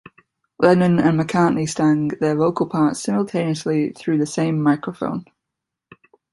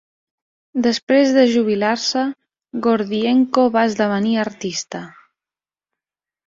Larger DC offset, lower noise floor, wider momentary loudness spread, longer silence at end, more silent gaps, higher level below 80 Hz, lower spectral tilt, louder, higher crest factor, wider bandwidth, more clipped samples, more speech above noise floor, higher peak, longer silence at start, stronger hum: neither; second, -83 dBFS vs under -90 dBFS; second, 7 LU vs 11 LU; second, 1.1 s vs 1.35 s; second, none vs 1.03-1.07 s; first, -58 dBFS vs -64 dBFS; first, -6.5 dB/octave vs -4.5 dB/octave; about the same, -19 LUFS vs -18 LUFS; about the same, 18 dB vs 18 dB; first, 11.5 kHz vs 7.6 kHz; neither; second, 64 dB vs over 73 dB; about the same, -2 dBFS vs -2 dBFS; second, 0.6 s vs 0.75 s; neither